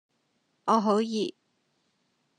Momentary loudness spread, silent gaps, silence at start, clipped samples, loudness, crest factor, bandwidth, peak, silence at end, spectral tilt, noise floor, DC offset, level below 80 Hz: 11 LU; none; 0.65 s; under 0.1%; -27 LUFS; 20 dB; 9.8 kHz; -10 dBFS; 1.1 s; -5.5 dB/octave; -74 dBFS; under 0.1%; -88 dBFS